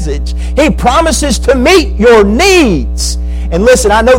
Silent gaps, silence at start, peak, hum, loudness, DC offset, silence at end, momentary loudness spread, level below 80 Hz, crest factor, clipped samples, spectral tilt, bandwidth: none; 0 s; 0 dBFS; none; -8 LUFS; under 0.1%; 0 s; 9 LU; -16 dBFS; 8 dB; 0.1%; -4.5 dB/octave; 16.5 kHz